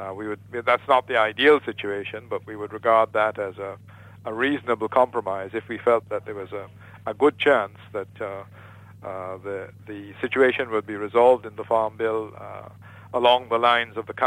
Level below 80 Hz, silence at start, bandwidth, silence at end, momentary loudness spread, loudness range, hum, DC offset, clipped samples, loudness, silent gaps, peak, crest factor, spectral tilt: -66 dBFS; 0 s; 11 kHz; 0 s; 17 LU; 4 LU; none; under 0.1%; under 0.1%; -23 LUFS; none; -4 dBFS; 18 dB; -5.5 dB/octave